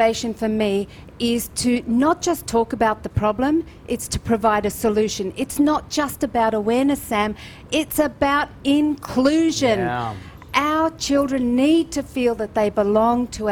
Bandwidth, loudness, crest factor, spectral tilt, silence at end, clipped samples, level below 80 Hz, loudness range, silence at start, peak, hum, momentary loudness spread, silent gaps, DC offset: 20 kHz; -20 LUFS; 14 dB; -4.5 dB/octave; 0 s; under 0.1%; -44 dBFS; 2 LU; 0 s; -6 dBFS; none; 7 LU; none; under 0.1%